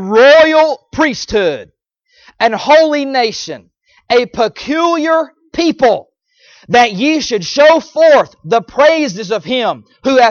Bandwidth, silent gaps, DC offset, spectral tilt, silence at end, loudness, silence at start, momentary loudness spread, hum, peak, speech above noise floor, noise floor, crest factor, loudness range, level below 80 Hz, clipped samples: 7.2 kHz; none; under 0.1%; -4 dB/octave; 0 s; -12 LUFS; 0 s; 9 LU; none; 0 dBFS; 42 dB; -54 dBFS; 12 dB; 4 LU; -48 dBFS; under 0.1%